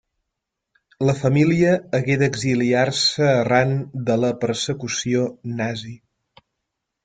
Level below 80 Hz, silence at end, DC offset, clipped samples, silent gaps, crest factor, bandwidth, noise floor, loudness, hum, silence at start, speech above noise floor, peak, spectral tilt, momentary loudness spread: -56 dBFS; 1.1 s; under 0.1%; under 0.1%; none; 18 dB; 9.4 kHz; -81 dBFS; -20 LUFS; none; 1 s; 61 dB; -4 dBFS; -5.5 dB/octave; 9 LU